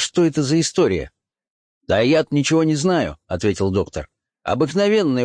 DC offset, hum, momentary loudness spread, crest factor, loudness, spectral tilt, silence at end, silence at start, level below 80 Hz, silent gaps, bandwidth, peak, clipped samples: under 0.1%; none; 9 LU; 12 dB; -19 LUFS; -5 dB/octave; 0 s; 0 s; -46 dBFS; 1.50-1.81 s; 10.5 kHz; -6 dBFS; under 0.1%